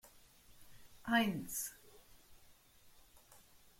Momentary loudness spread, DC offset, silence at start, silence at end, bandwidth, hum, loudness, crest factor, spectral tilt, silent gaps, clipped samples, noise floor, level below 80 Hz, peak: 29 LU; under 0.1%; 0.05 s; 0.4 s; 16.5 kHz; none; -38 LUFS; 24 dB; -3.5 dB/octave; none; under 0.1%; -64 dBFS; -70 dBFS; -20 dBFS